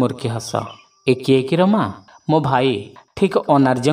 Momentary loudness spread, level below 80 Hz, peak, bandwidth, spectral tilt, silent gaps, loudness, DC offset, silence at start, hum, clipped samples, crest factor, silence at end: 11 LU; -56 dBFS; -2 dBFS; 16 kHz; -6.5 dB/octave; none; -18 LUFS; under 0.1%; 0 s; none; under 0.1%; 16 dB; 0 s